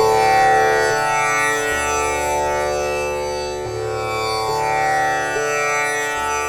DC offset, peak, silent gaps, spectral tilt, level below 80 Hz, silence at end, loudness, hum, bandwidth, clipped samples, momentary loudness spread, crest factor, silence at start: under 0.1%; -4 dBFS; none; -2.5 dB/octave; -42 dBFS; 0 s; -18 LUFS; none; 17.5 kHz; under 0.1%; 9 LU; 14 dB; 0 s